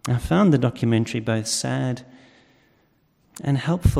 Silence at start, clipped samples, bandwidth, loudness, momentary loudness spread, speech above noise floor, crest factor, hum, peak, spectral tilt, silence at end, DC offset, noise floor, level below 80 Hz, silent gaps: 0.05 s; under 0.1%; 15 kHz; -22 LUFS; 9 LU; 42 dB; 16 dB; none; -6 dBFS; -6 dB/octave; 0 s; under 0.1%; -63 dBFS; -36 dBFS; none